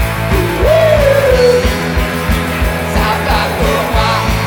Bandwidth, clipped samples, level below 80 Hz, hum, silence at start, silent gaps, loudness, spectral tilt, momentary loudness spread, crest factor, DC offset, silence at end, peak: 19.5 kHz; under 0.1%; -20 dBFS; none; 0 s; none; -12 LUFS; -5.5 dB/octave; 6 LU; 12 dB; under 0.1%; 0 s; 0 dBFS